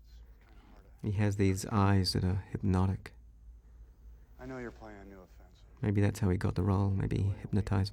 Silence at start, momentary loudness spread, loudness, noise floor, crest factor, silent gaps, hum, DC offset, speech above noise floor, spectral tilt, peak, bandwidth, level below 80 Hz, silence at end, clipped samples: 0.1 s; 19 LU; -32 LUFS; -56 dBFS; 16 dB; none; none; under 0.1%; 25 dB; -6.5 dB/octave; -16 dBFS; 13 kHz; -52 dBFS; 0 s; under 0.1%